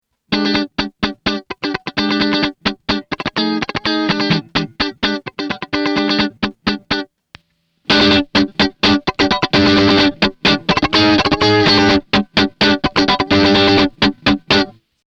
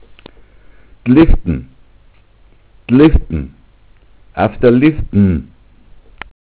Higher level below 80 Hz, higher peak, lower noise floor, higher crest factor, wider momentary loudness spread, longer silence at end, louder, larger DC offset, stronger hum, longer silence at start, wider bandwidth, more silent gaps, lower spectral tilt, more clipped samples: second, -38 dBFS vs -24 dBFS; about the same, -2 dBFS vs 0 dBFS; first, -60 dBFS vs -46 dBFS; about the same, 14 dB vs 14 dB; second, 10 LU vs 23 LU; second, 0.35 s vs 1.1 s; about the same, -15 LUFS vs -13 LUFS; neither; neither; second, 0.3 s vs 1.05 s; first, 8.2 kHz vs 4 kHz; neither; second, -5 dB/octave vs -12 dB/octave; neither